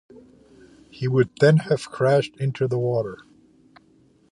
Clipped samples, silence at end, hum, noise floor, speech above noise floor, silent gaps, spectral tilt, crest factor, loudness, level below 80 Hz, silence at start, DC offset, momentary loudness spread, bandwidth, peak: under 0.1%; 1.15 s; none; -58 dBFS; 37 dB; none; -7.5 dB/octave; 20 dB; -22 LUFS; -62 dBFS; 0.95 s; under 0.1%; 11 LU; 11 kHz; -4 dBFS